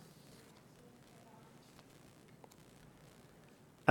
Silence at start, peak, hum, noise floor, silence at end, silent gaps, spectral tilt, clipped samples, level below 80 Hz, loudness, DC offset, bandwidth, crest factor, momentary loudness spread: 3.85 s; -8 dBFS; none; -62 dBFS; 0 s; none; -6 dB/octave; under 0.1%; -78 dBFS; -50 LUFS; under 0.1%; 18 kHz; 38 dB; 2 LU